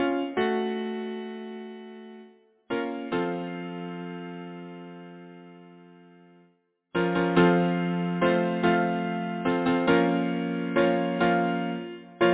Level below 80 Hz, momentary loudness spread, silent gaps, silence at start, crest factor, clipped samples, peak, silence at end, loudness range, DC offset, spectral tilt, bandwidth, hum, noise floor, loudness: -62 dBFS; 19 LU; none; 0 s; 18 dB; under 0.1%; -8 dBFS; 0 s; 12 LU; under 0.1%; -10.5 dB/octave; 4 kHz; none; -67 dBFS; -26 LUFS